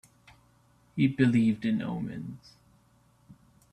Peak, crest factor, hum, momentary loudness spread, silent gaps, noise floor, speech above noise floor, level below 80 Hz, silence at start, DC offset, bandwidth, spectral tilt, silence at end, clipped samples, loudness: -12 dBFS; 20 dB; none; 18 LU; none; -64 dBFS; 37 dB; -64 dBFS; 0.95 s; under 0.1%; 10 kHz; -8 dB/octave; 0.4 s; under 0.1%; -28 LUFS